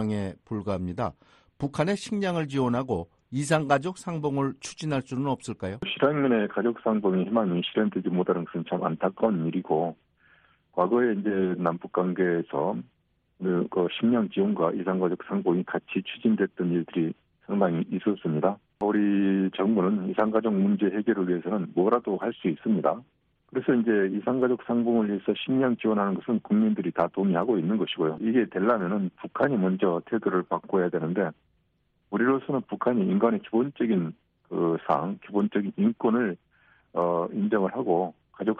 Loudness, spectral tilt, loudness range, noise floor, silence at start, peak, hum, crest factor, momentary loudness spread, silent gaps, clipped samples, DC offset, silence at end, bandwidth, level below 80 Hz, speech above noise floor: -27 LUFS; -7 dB/octave; 3 LU; -71 dBFS; 0 s; -8 dBFS; none; 18 dB; 8 LU; none; under 0.1%; under 0.1%; 0 s; 10.5 kHz; -64 dBFS; 45 dB